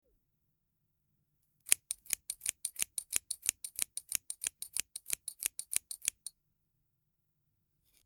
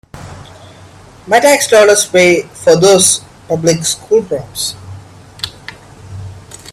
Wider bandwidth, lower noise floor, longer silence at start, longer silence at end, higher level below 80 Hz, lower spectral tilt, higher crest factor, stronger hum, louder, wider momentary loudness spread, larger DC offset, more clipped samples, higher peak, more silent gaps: first, over 20 kHz vs 16 kHz; first, -81 dBFS vs -38 dBFS; first, 1.65 s vs 0.15 s; first, 1.75 s vs 0 s; second, -74 dBFS vs -48 dBFS; second, 2.5 dB/octave vs -3 dB/octave; first, 40 dB vs 14 dB; neither; second, -36 LUFS vs -10 LUFS; second, 8 LU vs 25 LU; neither; neither; about the same, -2 dBFS vs 0 dBFS; neither